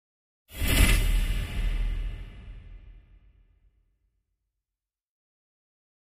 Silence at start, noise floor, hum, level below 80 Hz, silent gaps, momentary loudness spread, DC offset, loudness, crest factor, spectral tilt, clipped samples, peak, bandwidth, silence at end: 0.5 s; under -90 dBFS; none; -30 dBFS; none; 24 LU; under 0.1%; -28 LUFS; 24 dB; -4 dB/octave; under 0.1%; -6 dBFS; 15.5 kHz; 3.15 s